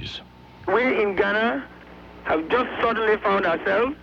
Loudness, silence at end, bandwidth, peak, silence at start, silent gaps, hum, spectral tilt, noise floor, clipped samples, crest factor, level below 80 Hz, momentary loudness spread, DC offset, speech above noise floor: -22 LUFS; 0 s; 7.2 kHz; -8 dBFS; 0 s; none; none; -6 dB/octave; -44 dBFS; under 0.1%; 14 dB; -52 dBFS; 14 LU; under 0.1%; 22 dB